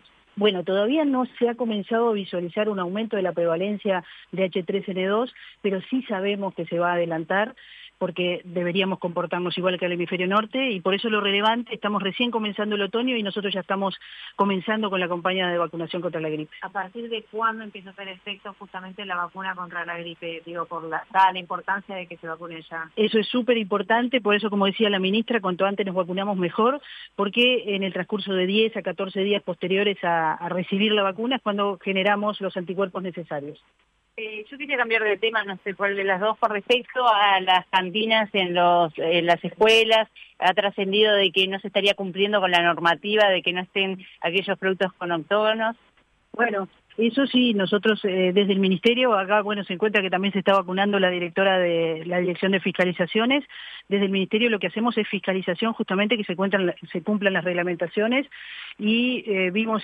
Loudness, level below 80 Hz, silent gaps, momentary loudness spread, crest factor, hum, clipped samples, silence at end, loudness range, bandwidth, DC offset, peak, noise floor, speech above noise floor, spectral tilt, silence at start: -23 LUFS; -72 dBFS; none; 12 LU; 18 dB; none; under 0.1%; 0 s; 7 LU; 9.8 kHz; under 0.1%; -6 dBFS; -49 dBFS; 25 dB; -6 dB/octave; 0.35 s